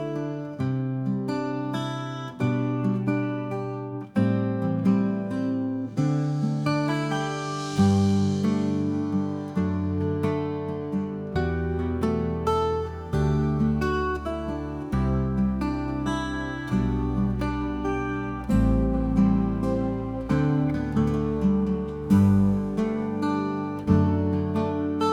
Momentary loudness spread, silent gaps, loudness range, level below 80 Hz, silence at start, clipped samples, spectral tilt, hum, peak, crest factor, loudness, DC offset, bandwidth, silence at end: 8 LU; none; 4 LU; -38 dBFS; 0 s; under 0.1%; -8 dB/octave; none; -8 dBFS; 16 dB; -26 LUFS; under 0.1%; 11.5 kHz; 0 s